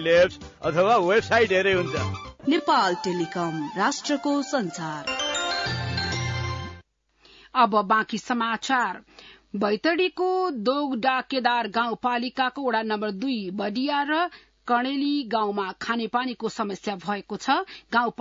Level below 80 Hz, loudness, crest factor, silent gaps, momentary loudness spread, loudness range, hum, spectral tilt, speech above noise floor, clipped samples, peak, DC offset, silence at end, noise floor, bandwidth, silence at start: -58 dBFS; -25 LUFS; 18 dB; none; 9 LU; 4 LU; none; -4.5 dB/octave; 35 dB; under 0.1%; -6 dBFS; under 0.1%; 0.1 s; -60 dBFS; 7.8 kHz; 0 s